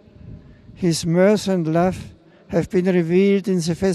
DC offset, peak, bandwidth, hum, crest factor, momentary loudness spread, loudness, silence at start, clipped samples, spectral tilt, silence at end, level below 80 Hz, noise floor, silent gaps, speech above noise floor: under 0.1%; -6 dBFS; 12.5 kHz; none; 14 dB; 8 LU; -19 LUFS; 0.25 s; under 0.1%; -6.5 dB/octave; 0 s; -48 dBFS; -41 dBFS; none; 23 dB